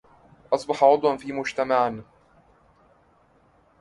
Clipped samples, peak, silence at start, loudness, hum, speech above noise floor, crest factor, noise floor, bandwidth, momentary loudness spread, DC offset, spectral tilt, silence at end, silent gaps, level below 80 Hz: under 0.1%; -4 dBFS; 0.5 s; -23 LUFS; none; 38 dB; 22 dB; -60 dBFS; 11.5 kHz; 10 LU; under 0.1%; -5 dB/octave; 1.8 s; none; -64 dBFS